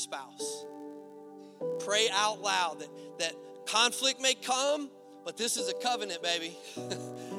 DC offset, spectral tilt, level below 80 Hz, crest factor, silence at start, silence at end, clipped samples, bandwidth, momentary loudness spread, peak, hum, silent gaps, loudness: under 0.1%; -1 dB/octave; -88 dBFS; 22 dB; 0 s; 0 s; under 0.1%; 16.5 kHz; 18 LU; -12 dBFS; none; none; -30 LUFS